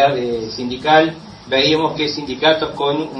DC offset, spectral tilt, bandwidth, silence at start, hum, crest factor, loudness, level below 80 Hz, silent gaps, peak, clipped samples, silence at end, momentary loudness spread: under 0.1%; -4.5 dB/octave; 10 kHz; 0 s; none; 18 dB; -17 LUFS; -50 dBFS; none; 0 dBFS; under 0.1%; 0 s; 9 LU